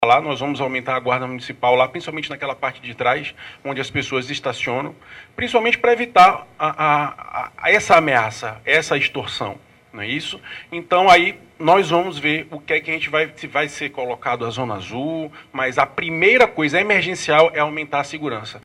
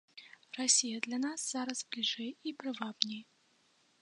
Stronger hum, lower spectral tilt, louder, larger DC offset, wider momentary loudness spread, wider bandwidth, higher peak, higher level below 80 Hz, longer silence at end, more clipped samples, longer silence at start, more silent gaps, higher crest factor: neither; first, -4 dB/octave vs -0.5 dB/octave; first, -18 LUFS vs -34 LUFS; neither; second, 14 LU vs 19 LU; first, 15 kHz vs 11 kHz; first, 0 dBFS vs -6 dBFS; first, -56 dBFS vs under -90 dBFS; second, 0.05 s vs 0.8 s; neither; second, 0 s vs 0.15 s; neither; second, 20 dB vs 32 dB